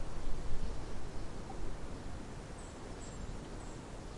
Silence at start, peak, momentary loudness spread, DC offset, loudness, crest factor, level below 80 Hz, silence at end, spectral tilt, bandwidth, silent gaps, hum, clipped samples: 0 s; -20 dBFS; 4 LU; under 0.1%; -47 LUFS; 16 dB; -44 dBFS; 0 s; -5.5 dB/octave; 11 kHz; none; none; under 0.1%